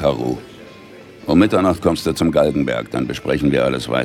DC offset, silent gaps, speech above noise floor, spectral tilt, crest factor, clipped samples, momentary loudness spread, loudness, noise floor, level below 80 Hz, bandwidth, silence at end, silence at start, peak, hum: under 0.1%; none; 23 dB; -6.5 dB/octave; 16 dB; under 0.1%; 10 LU; -18 LUFS; -40 dBFS; -40 dBFS; 16 kHz; 0 s; 0 s; -2 dBFS; none